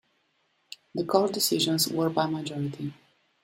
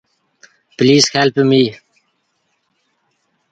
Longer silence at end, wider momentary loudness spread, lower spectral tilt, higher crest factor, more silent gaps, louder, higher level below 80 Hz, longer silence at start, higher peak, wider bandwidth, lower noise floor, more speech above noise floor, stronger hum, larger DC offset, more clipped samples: second, 0.5 s vs 1.8 s; first, 14 LU vs 5 LU; about the same, -4 dB/octave vs -4.5 dB/octave; about the same, 22 dB vs 18 dB; neither; second, -27 LUFS vs -13 LUFS; second, -70 dBFS vs -58 dBFS; first, 0.95 s vs 0.8 s; second, -8 dBFS vs 0 dBFS; first, 16 kHz vs 9.2 kHz; first, -71 dBFS vs -66 dBFS; second, 45 dB vs 54 dB; neither; neither; neither